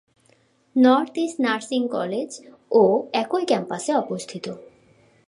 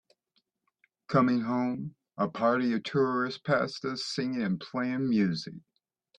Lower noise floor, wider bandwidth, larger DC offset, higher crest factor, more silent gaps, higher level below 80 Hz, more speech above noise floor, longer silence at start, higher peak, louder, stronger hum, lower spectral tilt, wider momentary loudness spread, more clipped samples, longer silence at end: second, -61 dBFS vs -76 dBFS; first, 11.5 kHz vs 9.6 kHz; neither; about the same, 18 dB vs 18 dB; neither; second, -76 dBFS vs -70 dBFS; second, 39 dB vs 48 dB; second, 0.75 s vs 1.1 s; first, -4 dBFS vs -12 dBFS; first, -22 LUFS vs -29 LUFS; neither; second, -5 dB/octave vs -6.5 dB/octave; first, 16 LU vs 7 LU; neither; about the same, 0.65 s vs 0.6 s